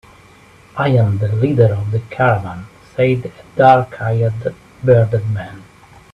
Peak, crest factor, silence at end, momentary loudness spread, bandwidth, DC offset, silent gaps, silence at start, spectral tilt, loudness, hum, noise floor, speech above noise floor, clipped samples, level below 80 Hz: 0 dBFS; 16 dB; 0.5 s; 15 LU; 5.6 kHz; under 0.1%; none; 0.75 s; -9 dB/octave; -16 LUFS; none; -45 dBFS; 30 dB; under 0.1%; -48 dBFS